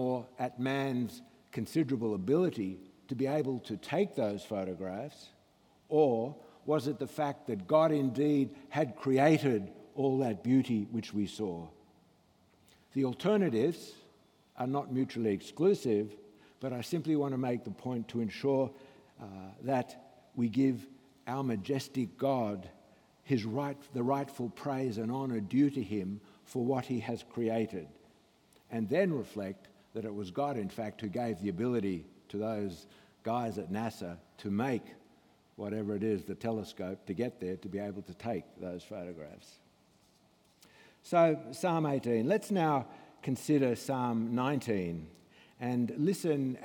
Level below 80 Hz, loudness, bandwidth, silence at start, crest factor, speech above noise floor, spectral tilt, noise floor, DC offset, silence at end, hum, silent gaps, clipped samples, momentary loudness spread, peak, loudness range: -76 dBFS; -34 LUFS; 18 kHz; 0 s; 20 dB; 34 dB; -7 dB/octave; -67 dBFS; under 0.1%; 0 s; none; none; under 0.1%; 14 LU; -14 dBFS; 7 LU